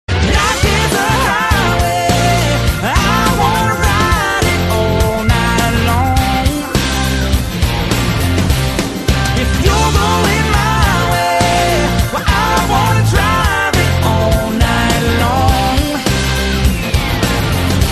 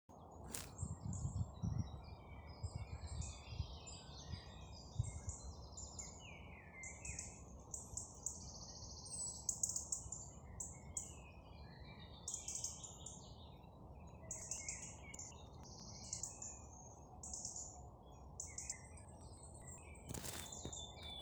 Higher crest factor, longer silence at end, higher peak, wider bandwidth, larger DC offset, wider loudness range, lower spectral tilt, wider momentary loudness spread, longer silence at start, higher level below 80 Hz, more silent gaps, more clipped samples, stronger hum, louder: second, 12 dB vs 28 dB; about the same, 0 s vs 0 s; first, 0 dBFS vs -22 dBFS; second, 13.5 kHz vs over 20 kHz; neither; second, 2 LU vs 6 LU; first, -4.5 dB/octave vs -3 dB/octave; second, 3 LU vs 13 LU; about the same, 0.1 s vs 0.1 s; first, -20 dBFS vs -58 dBFS; neither; neither; neither; first, -13 LUFS vs -49 LUFS